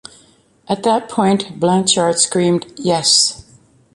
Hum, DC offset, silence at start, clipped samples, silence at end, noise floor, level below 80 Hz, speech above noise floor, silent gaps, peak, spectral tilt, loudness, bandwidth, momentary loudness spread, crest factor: none; under 0.1%; 0.7 s; under 0.1%; 0.55 s; -51 dBFS; -56 dBFS; 36 dB; none; 0 dBFS; -3.5 dB/octave; -15 LUFS; 11.5 kHz; 8 LU; 16 dB